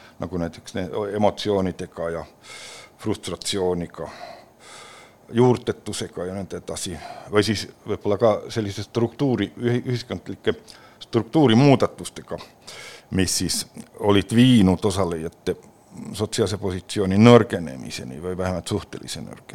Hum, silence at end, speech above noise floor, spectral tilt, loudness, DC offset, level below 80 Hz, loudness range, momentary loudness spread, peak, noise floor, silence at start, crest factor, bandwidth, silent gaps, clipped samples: none; 0.2 s; 23 dB; -5.5 dB/octave; -22 LUFS; under 0.1%; -52 dBFS; 6 LU; 20 LU; 0 dBFS; -46 dBFS; 0.2 s; 22 dB; 16 kHz; none; under 0.1%